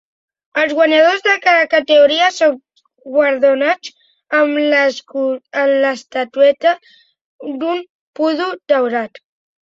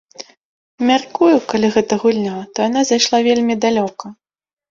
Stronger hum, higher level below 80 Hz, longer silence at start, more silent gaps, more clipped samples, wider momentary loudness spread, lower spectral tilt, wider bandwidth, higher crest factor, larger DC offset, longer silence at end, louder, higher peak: neither; second, -66 dBFS vs -58 dBFS; first, 0.55 s vs 0.2 s; first, 7.21-7.39 s, 7.90-8.14 s vs 0.44-0.78 s; neither; about the same, 12 LU vs 14 LU; second, -2.5 dB/octave vs -4 dB/octave; about the same, 7.8 kHz vs 7.6 kHz; about the same, 14 dB vs 16 dB; neither; about the same, 0.55 s vs 0.6 s; about the same, -14 LUFS vs -16 LUFS; about the same, -2 dBFS vs -2 dBFS